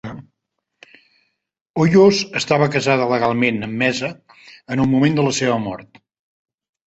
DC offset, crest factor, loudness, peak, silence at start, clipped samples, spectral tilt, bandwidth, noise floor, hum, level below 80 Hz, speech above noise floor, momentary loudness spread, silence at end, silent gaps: under 0.1%; 18 dB; -17 LUFS; -2 dBFS; 0.05 s; under 0.1%; -5.5 dB/octave; 8.2 kHz; -77 dBFS; none; -54 dBFS; 60 dB; 16 LU; 1.05 s; 1.61-1.74 s